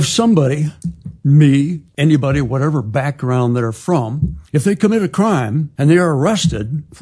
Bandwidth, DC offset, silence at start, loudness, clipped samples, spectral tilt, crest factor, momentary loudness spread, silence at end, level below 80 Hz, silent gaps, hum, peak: 11 kHz; under 0.1%; 0 s; -15 LUFS; under 0.1%; -6.5 dB/octave; 14 dB; 9 LU; 0.2 s; -38 dBFS; none; none; 0 dBFS